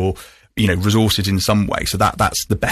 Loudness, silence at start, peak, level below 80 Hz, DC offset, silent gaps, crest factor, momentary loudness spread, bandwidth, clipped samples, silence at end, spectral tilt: -17 LUFS; 0 s; -2 dBFS; -34 dBFS; under 0.1%; none; 14 dB; 7 LU; 14 kHz; under 0.1%; 0 s; -4.5 dB/octave